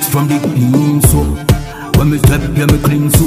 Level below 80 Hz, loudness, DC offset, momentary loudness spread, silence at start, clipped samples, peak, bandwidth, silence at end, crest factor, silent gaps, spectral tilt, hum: -20 dBFS; -12 LUFS; under 0.1%; 5 LU; 0 s; 0.1%; 0 dBFS; 16.5 kHz; 0 s; 10 dB; none; -6 dB/octave; none